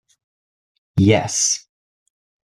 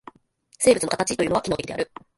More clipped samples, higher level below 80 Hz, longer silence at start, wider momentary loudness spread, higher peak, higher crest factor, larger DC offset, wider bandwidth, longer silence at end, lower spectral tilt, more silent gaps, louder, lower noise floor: neither; about the same, -54 dBFS vs -52 dBFS; first, 0.95 s vs 0.6 s; about the same, 9 LU vs 10 LU; about the same, -2 dBFS vs -4 dBFS; about the same, 20 dB vs 20 dB; neither; first, 13.5 kHz vs 12 kHz; first, 0.9 s vs 0.35 s; about the same, -4 dB/octave vs -3.5 dB/octave; neither; first, -18 LUFS vs -23 LUFS; first, under -90 dBFS vs -59 dBFS